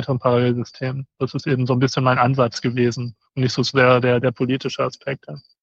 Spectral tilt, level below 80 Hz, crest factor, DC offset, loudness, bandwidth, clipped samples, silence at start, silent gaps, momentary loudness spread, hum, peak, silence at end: -6.5 dB/octave; -60 dBFS; 18 dB; under 0.1%; -20 LUFS; 7.6 kHz; under 0.1%; 0 s; none; 13 LU; none; -2 dBFS; 0.25 s